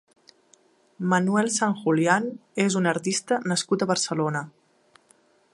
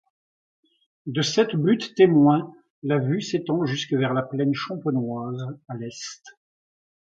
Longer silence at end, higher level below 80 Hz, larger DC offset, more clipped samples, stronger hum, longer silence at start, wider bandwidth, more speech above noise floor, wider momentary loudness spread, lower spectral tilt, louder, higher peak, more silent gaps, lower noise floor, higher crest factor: first, 1.05 s vs 0.9 s; second, -74 dBFS vs -68 dBFS; neither; neither; neither; about the same, 1 s vs 1.05 s; first, 11.5 kHz vs 7.8 kHz; second, 37 dB vs over 67 dB; second, 8 LU vs 17 LU; second, -4.5 dB/octave vs -6 dB/octave; about the same, -24 LUFS vs -23 LUFS; about the same, -4 dBFS vs -4 dBFS; second, none vs 2.70-2.82 s; second, -61 dBFS vs under -90 dBFS; about the same, 20 dB vs 20 dB